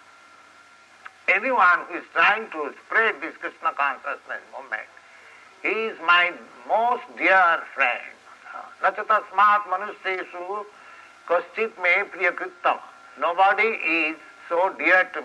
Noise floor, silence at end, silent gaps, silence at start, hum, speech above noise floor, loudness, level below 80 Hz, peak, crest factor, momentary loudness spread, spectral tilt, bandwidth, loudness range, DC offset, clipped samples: -51 dBFS; 0 s; none; 1.3 s; none; 29 dB; -22 LUFS; -80 dBFS; -6 dBFS; 18 dB; 14 LU; -3 dB/octave; 11.5 kHz; 4 LU; under 0.1%; under 0.1%